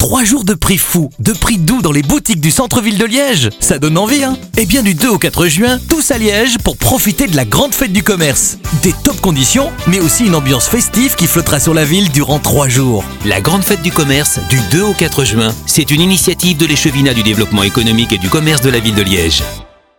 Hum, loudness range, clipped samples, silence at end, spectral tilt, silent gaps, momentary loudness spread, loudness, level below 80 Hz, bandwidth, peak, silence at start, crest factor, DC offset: none; 1 LU; under 0.1%; 0.35 s; -4 dB/octave; none; 3 LU; -10 LUFS; -28 dBFS; 18 kHz; 0 dBFS; 0 s; 12 dB; 0.3%